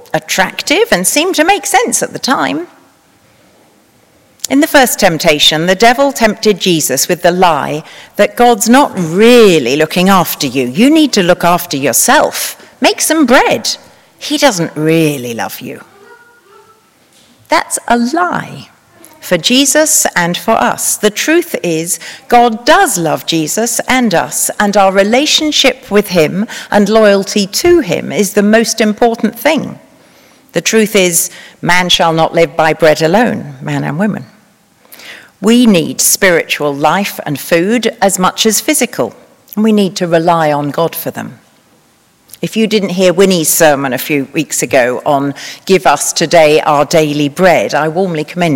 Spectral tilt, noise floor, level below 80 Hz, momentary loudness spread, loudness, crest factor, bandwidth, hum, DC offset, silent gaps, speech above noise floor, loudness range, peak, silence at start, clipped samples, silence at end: -3.5 dB/octave; -50 dBFS; -44 dBFS; 10 LU; -10 LUFS; 12 dB; over 20 kHz; none; under 0.1%; none; 39 dB; 5 LU; 0 dBFS; 0.15 s; 1%; 0 s